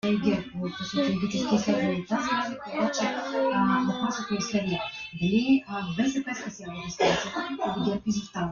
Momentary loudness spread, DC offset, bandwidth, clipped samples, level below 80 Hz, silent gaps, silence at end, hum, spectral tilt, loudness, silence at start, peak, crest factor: 8 LU; under 0.1%; 7.2 kHz; under 0.1%; -58 dBFS; none; 0 s; none; -5 dB/octave; -27 LUFS; 0.05 s; -10 dBFS; 16 dB